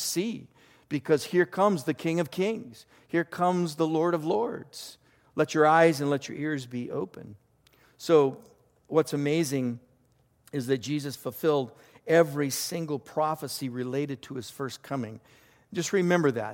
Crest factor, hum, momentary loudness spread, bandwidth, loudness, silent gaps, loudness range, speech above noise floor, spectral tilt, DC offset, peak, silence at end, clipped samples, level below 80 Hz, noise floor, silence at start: 20 dB; none; 16 LU; 17 kHz; -28 LUFS; none; 4 LU; 39 dB; -5.5 dB/octave; under 0.1%; -8 dBFS; 0 s; under 0.1%; -72 dBFS; -66 dBFS; 0 s